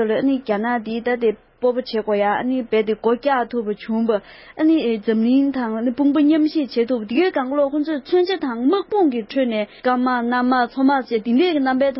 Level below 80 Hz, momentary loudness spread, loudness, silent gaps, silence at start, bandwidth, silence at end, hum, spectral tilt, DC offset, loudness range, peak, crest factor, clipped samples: -58 dBFS; 5 LU; -19 LUFS; none; 0 s; 5.8 kHz; 0 s; none; -10 dB/octave; under 0.1%; 2 LU; -6 dBFS; 12 dB; under 0.1%